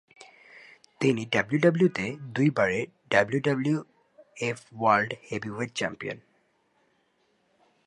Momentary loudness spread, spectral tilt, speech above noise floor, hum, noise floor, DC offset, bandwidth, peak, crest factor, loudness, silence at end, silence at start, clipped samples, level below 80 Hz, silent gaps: 10 LU; -6 dB/octave; 44 dB; none; -70 dBFS; under 0.1%; 11 kHz; -6 dBFS; 22 dB; -27 LUFS; 1.7 s; 0.2 s; under 0.1%; -66 dBFS; none